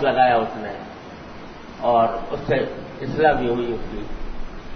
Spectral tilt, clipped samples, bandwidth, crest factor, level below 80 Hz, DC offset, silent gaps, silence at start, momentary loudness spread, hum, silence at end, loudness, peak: -7 dB/octave; under 0.1%; 6.4 kHz; 18 dB; -36 dBFS; under 0.1%; none; 0 s; 20 LU; none; 0 s; -21 LUFS; -4 dBFS